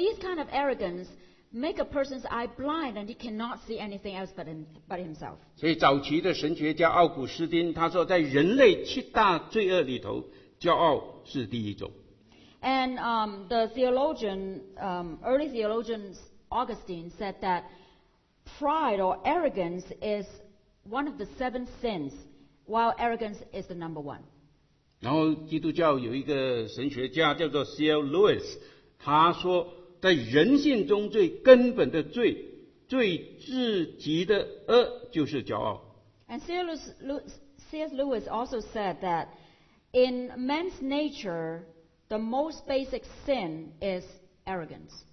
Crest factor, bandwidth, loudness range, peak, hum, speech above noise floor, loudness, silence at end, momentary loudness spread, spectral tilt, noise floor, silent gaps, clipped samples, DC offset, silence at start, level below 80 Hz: 26 dB; 6.4 kHz; 10 LU; -2 dBFS; none; 38 dB; -28 LUFS; 0.1 s; 15 LU; -6 dB/octave; -66 dBFS; none; under 0.1%; under 0.1%; 0 s; -56 dBFS